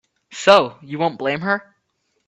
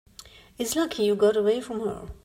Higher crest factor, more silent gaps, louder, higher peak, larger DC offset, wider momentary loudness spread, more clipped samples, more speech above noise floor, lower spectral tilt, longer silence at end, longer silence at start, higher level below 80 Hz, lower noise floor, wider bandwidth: about the same, 20 dB vs 16 dB; neither; first, -18 LUFS vs -25 LUFS; first, 0 dBFS vs -10 dBFS; neither; about the same, 12 LU vs 11 LU; neither; first, 52 dB vs 25 dB; about the same, -4 dB/octave vs -4 dB/octave; first, 0.65 s vs 0.1 s; about the same, 0.3 s vs 0.2 s; second, -64 dBFS vs -52 dBFS; first, -70 dBFS vs -50 dBFS; second, 8.4 kHz vs 16 kHz